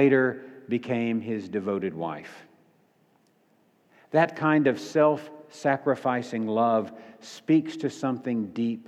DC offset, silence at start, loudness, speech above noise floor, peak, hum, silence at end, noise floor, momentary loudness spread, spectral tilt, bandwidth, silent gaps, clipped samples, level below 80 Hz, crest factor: under 0.1%; 0 s; -26 LUFS; 39 dB; -8 dBFS; none; 0.05 s; -65 dBFS; 16 LU; -7 dB/octave; 10.5 kHz; none; under 0.1%; -78 dBFS; 20 dB